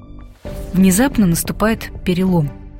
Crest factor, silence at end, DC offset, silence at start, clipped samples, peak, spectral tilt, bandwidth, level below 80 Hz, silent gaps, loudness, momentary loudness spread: 14 dB; 0 s; under 0.1%; 0 s; under 0.1%; -2 dBFS; -5.5 dB/octave; 16.5 kHz; -32 dBFS; none; -16 LUFS; 16 LU